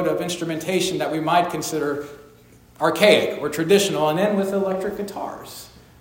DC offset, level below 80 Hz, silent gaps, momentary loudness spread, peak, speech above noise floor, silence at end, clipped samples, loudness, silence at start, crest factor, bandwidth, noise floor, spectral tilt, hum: under 0.1%; -58 dBFS; none; 15 LU; 0 dBFS; 29 dB; 0.2 s; under 0.1%; -21 LUFS; 0 s; 20 dB; 16.5 kHz; -50 dBFS; -4 dB/octave; none